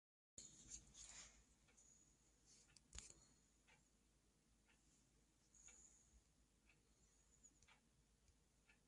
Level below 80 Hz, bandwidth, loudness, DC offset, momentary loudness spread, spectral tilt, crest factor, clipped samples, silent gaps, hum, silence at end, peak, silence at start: -78 dBFS; 11 kHz; -62 LUFS; under 0.1%; 8 LU; -1.5 dB/octave; 32 dB; under 0.1%; none; none; 0 s; -38 dBFS; 0.35 s